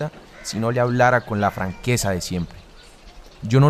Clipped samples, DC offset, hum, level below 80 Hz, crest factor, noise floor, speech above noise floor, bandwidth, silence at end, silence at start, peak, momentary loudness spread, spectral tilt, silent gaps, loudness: under 0.1%; under 0.1%; none; -44 dBFS; 18 dB; -45 dBFS; 25 dB; 14 kHz; 0 s; 0 s; -4 dBFS; 15 LU; -5.5 dB/octave; none; -21 LUFS